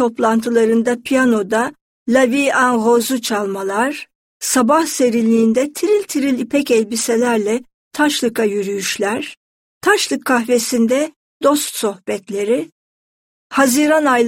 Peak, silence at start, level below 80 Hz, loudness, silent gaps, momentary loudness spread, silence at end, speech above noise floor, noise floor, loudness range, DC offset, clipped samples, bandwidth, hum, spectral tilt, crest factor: -2 dBFS; 0 s; -60 dBFS; -16 LUFS; 1.81-2.06 s, 4.15-4.40 s, 7.74-7.91 s, 9.37-9.81 s, 11.16-11.40 s, 12.72-13.50 s; 8 LU; 0 s; over 74 dB; under -90 dBFS; 3 LU; under 0.1%; under 0.1%; 16.5 kHz; none; -3.5 dB/octave; 16 dB